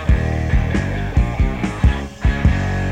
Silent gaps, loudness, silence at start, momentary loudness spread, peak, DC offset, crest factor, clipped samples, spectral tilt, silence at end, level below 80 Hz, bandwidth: none; -19 LUFS; 0 s; 3 LU; -2 dBFS; under 0.1%; 16 dB; under 0.1%; -7.5 dB/octave; 0 s; -20 dBFS; 9 kHz